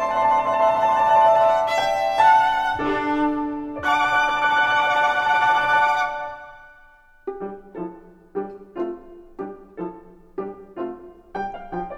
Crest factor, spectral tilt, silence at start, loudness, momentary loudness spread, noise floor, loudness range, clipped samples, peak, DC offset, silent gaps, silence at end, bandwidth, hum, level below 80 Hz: 18 dB; -4 dB/octave; 0 s; -19 LUFS; 19 LU; -51 dBFS; 15 LU; under 0.1%; -4 dBFS; under 0.1%; none; 0 s; 12.5 kHz; none; -52 dBFS